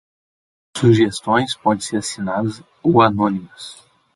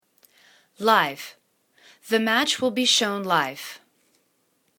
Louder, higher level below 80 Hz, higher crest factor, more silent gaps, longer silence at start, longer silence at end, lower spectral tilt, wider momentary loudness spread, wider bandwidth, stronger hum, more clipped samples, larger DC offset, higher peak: first, -18 LUFS vs -22 LUFS; first, -52 dBFS vs -74 dBFS; about the same, 18 dB vs 22 dB; neither; about the same, 0.75 s vs 0.8 s; second, 0.4 s vs 1 s; first, -5.5 dB/octave vs -2 dB/octave; about the same, 17 LU vs 18 LU; second, 11.5 kHz vs 19 kHz; neither; neither; neither; about the same, -2 dBFS vs -4 dBFS